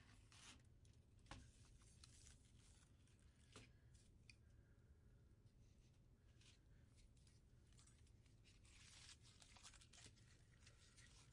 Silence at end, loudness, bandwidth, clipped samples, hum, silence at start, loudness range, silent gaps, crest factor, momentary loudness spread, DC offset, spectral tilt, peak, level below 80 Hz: 0 s; -66 LUFS; 11 kHz; under 0.1%; none; 0 s; 3 LU; none; 26 dB; 5 LU; under 0.1%; -3 dB/octave; -44 dBFS; -74 dBFS